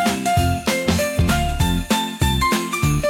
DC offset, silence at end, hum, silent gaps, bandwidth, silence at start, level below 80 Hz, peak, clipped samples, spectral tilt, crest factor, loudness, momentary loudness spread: under 0.1%; 0 s; none; none; 17 kHz; 0 s; -28 dBFS; -6 dBFS; under 0.1%; -4.5 dB/octave; 14 dB; -19 LUFS; 2 LU